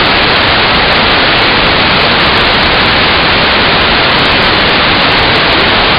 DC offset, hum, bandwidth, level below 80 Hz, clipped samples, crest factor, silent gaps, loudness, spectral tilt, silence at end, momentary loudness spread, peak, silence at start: under 0.1%; none; 17 kHz; -26 dBFS; 0.2%; 8 dB; none; -6 LUFS; -6 dB/octave; 0 s; 0 LU; 0 dBFS; 0 s